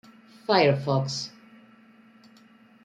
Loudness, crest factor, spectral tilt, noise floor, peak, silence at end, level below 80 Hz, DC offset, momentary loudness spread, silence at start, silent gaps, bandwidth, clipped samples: -24 LUFS; 22 dB; -5.5 dB/octave; -55 dBFS; -6 dBFS; 1.55 s; -70 dBFS; under 0.1%; 17 LU; 0.5 s; none; 9.2 kHz; under 0.1%